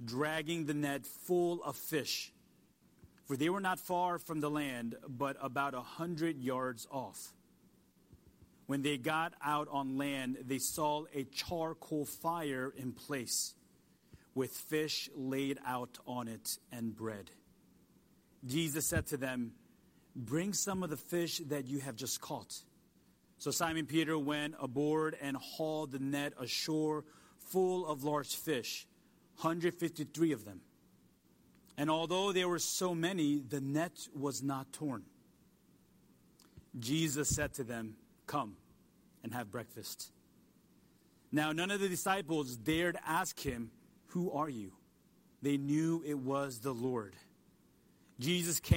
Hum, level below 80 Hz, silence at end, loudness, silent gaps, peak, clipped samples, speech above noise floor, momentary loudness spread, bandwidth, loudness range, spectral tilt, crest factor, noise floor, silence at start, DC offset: none; -66 dBFS; 0 s; -37 LUFS; none; -14 dBFS; under 0.1%; 32 dB; 11 LU; 16.5 kHz; 4 LU; -4 dB/octave; 24 dB; -69 dBFS; 0 s; under 0.1%